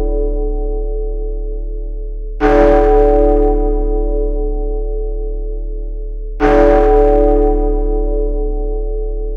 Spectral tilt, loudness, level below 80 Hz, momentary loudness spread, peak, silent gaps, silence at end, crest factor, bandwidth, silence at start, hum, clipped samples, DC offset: -9 dB/octave; -15 LUFS; -16 dBFS; 17 LU; 0 dBFS; none; 0 s; 14 dB; 4.3 kHz; 0 s; none; under 0.1%; under 0.1%